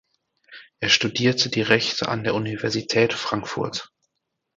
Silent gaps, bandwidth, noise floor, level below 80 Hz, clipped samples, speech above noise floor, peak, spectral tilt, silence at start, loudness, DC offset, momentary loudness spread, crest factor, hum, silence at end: none; 9.2 kHz; -79 dBFS; -58 dBFS; under 0.1%; 57 dB; 0 dBFS; -4 dB/octave; 0.5 s; -22 LUFS; under 0.1%; 9 LU; 24 dB; none; 0.7 s